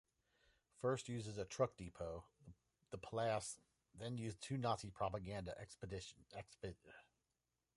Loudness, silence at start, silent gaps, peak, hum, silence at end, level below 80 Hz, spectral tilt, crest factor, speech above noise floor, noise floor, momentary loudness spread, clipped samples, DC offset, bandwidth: -47 LUFS; 0.8 s; none; -24 dBFS; none; 0.75 s; -68 dBFS; -5 dB/octave; 24 dB; over 44 dB; under -90 dBFS; 15 LU; under 0.1%; under 0.1%; 11.5 kHz